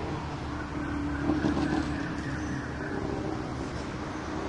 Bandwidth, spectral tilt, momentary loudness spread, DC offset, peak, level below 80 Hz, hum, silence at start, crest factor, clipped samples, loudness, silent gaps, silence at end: 11 kHz; -6.5 dB/octave; 7 LU; under 0.1%; -14 dBFS; -44 dBFS; none; 0 s; 18 dB; under 0.1%; -32 LUFS; none; 0 s